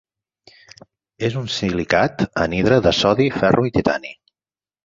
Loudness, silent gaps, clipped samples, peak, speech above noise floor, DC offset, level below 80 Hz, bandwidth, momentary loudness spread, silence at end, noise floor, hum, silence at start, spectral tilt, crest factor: -18 LUFS; none; under 0.1%; -2 dBFS; over 72 dB; under 0.1%; -44 dBFS; 7.8 kHz; 9 LU; 0.7 s; under -90 dBFS; none; 1.2 s; -5.5 dB/octave; 18 dB